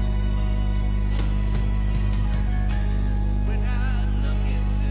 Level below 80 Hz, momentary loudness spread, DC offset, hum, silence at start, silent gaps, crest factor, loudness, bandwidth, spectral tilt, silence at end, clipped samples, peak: -22 dBFS; 0 LU; under 0.1%; 50 Hz at -20 dBFS; 0 s; none; 8 dB; -25 LUFS; 4 kHz; -11 dB/octave; 0 s; under 0.1%; -12 dBFS